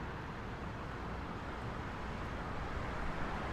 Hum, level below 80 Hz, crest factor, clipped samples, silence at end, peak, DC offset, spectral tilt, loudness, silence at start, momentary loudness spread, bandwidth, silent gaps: none; -48 dBFS; 16 dB; under 0.1%; 0 s; -26 dBFS; under 0.1%; -6.5 dB/octave; -43 LUFS; 0 s; 3 LU; 13.5 kHz; none